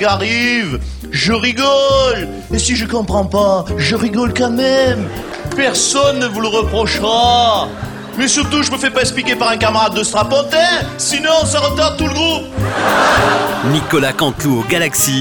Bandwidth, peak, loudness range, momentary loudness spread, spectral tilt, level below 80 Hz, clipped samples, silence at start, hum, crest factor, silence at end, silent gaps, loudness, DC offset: over 20 kHz; -2 dBFS; 1 LU; 6 LU; -3.5 dB/octave; -32 dBFS; under 0.1%; 0 s; none; 12 dB; 0 s; none; -14 LUFS; under 0.1%